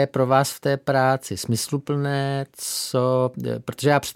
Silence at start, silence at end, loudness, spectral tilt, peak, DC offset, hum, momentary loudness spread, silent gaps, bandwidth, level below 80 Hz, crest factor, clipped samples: 0 s; 0.05 s; -23 LUFS; -5 dB/octave; -4 dBFS; under 0.1%; none; 7 LU; none; 17 kHz; -60 dBFS; 18 dB; under 0.1%